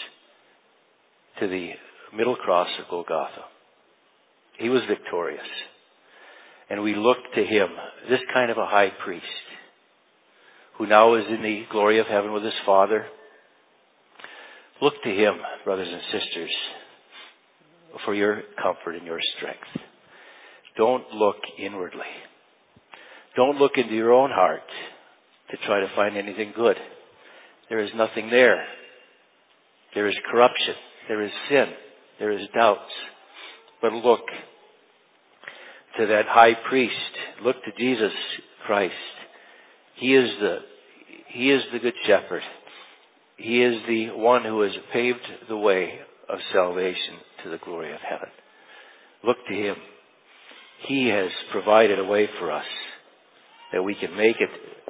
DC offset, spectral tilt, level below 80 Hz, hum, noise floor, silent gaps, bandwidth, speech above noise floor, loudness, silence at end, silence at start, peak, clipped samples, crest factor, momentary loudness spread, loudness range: under 0.1%; -8 dB/octave; -72 dBFS; none; -62 dBFS; none; 4 kHz; 39 dB; -23 LUFS; 0.15 s; 0 s; 0 dBFS; under 0.1%; 24 dB; 19 LU; 7 LU